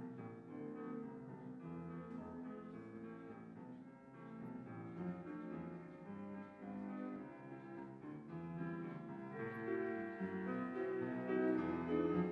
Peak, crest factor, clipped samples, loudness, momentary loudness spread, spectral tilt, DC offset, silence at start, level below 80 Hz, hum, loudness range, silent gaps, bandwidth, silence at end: -26 dBFS; 20 dB; under 0.1%; -46 LUFS; 14 LU; -9.5 dB/octave; under 0.1%; 0 s; -80 dBFS; none; 9 LU; none; 6.4 kHz; 0 s